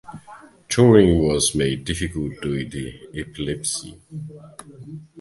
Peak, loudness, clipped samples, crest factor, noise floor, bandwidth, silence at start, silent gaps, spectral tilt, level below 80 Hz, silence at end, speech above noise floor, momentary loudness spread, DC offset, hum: 0 dBFS; -20 LUFS; under 0.1%; 22 dB; -45 dBFS; 12 kHz; 0.1 s; none; -5 dB/octave; -40 dBFS; 0 s; 24 dB; 25 LU; under 0.1%; none